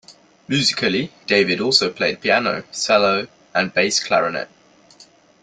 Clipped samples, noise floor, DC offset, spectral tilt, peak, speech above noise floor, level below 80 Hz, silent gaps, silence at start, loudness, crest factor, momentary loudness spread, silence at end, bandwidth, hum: under 0.1%; -50 dBFS; under 0.1%; -3 dB/octave; -2 dBFS; 31 dB; -62 dBFS; none; 0.1 s; -18 LUFS; 18 dB; 8 LU; 0.4 s; 9.6 kHz; none